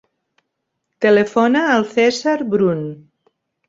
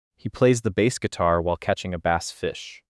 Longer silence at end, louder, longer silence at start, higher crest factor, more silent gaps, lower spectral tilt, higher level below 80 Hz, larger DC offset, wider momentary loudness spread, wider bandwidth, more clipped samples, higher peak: first, 0.75 s vs 0.2 s; first, -16 LUFS vs -24 LUFS; first, 1 s vs 0.25 s; about the same, 16 dB vs 18 dB; neither; about the same, -5.5 dB/octave vs -5.5 dB/octave; second, -64 dBFS vs -50 dBFS; neither; second, 6 LU vs 10 LU; second, 7.8 kHz vs 12 kHz; neither; first, -2 dBFS vs -6 dBFS